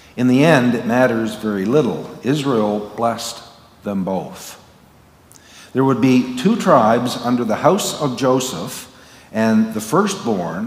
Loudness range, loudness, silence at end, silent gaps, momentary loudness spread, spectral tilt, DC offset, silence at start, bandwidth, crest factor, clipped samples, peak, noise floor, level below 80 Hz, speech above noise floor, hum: 7 LU; -17 LUFS; 0 s; none; 14 LU; -5.5 dB/octave; under 0.1%; 0.15 s; 16 kHz; 18 dB; under 0.1%; 0 dBFS; -48 dBFS; -58 dBFS; 31 dB; none